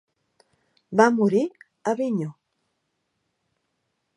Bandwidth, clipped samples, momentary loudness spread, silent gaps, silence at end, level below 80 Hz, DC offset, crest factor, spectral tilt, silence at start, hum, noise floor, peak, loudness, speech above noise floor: 11 kHz; under 0.1%; 13 LU; none; 1.85 s; -78 dBFS; under 0.1%; 24 dB; -6.5 dB/octave; 0.9 s; none; -76 dBFS; -2 dBFS; -23 LUFS; 55 dB